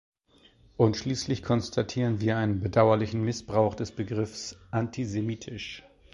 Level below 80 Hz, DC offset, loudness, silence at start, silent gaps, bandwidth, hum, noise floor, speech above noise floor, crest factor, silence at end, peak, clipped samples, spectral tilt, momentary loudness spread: -52 dBFS; under 0.1%; -28 LUFS; 0.8 s; none; 11 kHz; none; -61 dBFS; 34 dB; 22 dB; 0.35 s; -6 dBFS; under 0.1%; -6.5 dB/octave; 14 LU